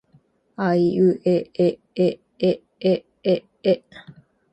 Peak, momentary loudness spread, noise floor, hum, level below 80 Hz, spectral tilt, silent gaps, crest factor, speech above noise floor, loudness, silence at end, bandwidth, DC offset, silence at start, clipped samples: -6 dBFS; 6 LU; -59 dBFS; none; -64 dBFS; -8.5 dB/octave; none; 16 dB; 39 dB; -22 LUFS; 0.4 s; 8.4 kHz; under 0.1%; 0.6 s; under 0.1%